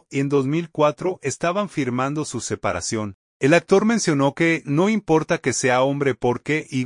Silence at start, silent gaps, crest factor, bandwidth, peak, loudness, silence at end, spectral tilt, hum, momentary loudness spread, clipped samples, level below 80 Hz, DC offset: 0.1 s; 3.14-3.40 s; 18 dB; 11 kHz; -2 dBFS; -21 LUFS; 0 s; -5 dB/octave; none; 7 LU; under 0.1%; -56 dBFS; under 0.1%